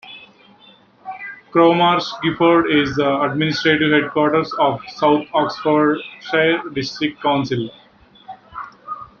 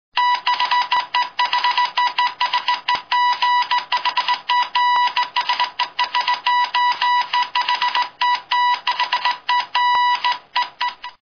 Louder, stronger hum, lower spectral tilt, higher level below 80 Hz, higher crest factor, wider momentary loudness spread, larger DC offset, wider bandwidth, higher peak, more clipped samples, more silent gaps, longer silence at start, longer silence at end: about the same, -17 LUFS vs -18 LUFS; neither; first, -6 dB/octave vs 1 dB/octave; first, -54 dBFS vs -70 dBFS; about the same, 16 dB vs 16 dB; first, 18 LU vs 4 LU; neither; about the same, 7 kHz vs 6.6 kHz; about the same, -2 dBFS vs -4 dBFS; neither; neither; about the same, 0.05 s vs 0.15 s; about the same, 0.15 s vs 0.15 s